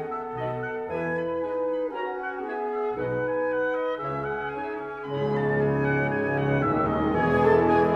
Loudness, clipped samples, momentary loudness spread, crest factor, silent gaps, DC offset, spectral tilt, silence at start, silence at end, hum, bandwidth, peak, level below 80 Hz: -26 LUFS; under 0.1%; 10 LU; 16 dB; none; under 0.1%; -9 dB/octave; 0 s; 0 s; none; 6.4 kHz; -10 dBFS; -50 dBFS